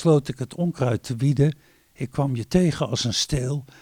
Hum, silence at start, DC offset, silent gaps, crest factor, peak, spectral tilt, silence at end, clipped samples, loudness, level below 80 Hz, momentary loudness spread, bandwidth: none; 0 s; under 0.1%; none; 16 dB; -6 dBFS; -6 dB/octave; 0.15 s; under 0.1%; -24 LUFS; -44 dBFS; 10 LU; 15.5 kHz